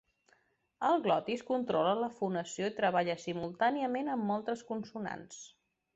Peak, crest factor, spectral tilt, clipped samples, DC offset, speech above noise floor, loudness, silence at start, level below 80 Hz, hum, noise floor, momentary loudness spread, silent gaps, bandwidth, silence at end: -16 dBFS; 20 dB; -5 dB/octave; under 0.1%; under 0.1%; 39 dB; -33 LUFS; 0.8 s; -74 dBFS; none; -72 dBFS; 11 LU; none; 8.2 kHz; 0.5 s